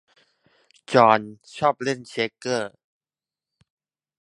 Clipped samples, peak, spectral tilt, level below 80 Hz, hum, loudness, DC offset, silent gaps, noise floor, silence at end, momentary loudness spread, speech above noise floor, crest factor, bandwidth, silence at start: under 0.1%; 0 dBFS; -5 dB/octave; -68 dBFS; none; -22 LUFS; under 0.1%; none; under -90 dBFS; 1.55 s; 11 LU; over 68 dB; 24 dB; 11.5 kHz; 0.9 s